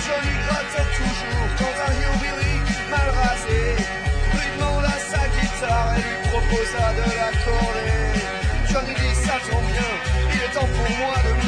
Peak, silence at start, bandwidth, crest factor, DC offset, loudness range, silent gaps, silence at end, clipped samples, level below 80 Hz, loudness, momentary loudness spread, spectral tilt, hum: -10 dBFS; 0 s; 10.5 kHz; 12 dB; under 0.1%; 0 LU; none; 0 s; under 0.1%; -24 dBFS; -22 LUFS; 2 LU; -5 dB/octave; none